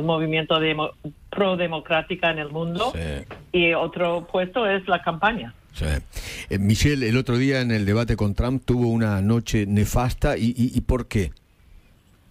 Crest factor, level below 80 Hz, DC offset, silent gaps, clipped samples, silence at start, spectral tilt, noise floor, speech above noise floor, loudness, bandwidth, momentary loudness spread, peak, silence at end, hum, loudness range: 16 dB; -36 dBFS; under 0.1%; none; under 0.1%; 0 s; -6 dB/octave; -55 dBFS; 33 dB; -23 LUFS; 16 kHz; 9 LU; -6 dBFS; 0.95 s; none; 2 LU